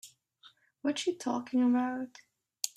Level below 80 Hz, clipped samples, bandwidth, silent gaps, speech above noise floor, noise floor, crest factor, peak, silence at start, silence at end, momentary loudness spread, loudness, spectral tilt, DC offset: -82 dBFS; under 0.1%; 15 kHz; none; 32 dB; -62 dBFS; 22 dB; -10 dBFS; 0.05 s; 0.1 s; 11 LU; -32 LUFS; -3 dB/octave; under 0.1%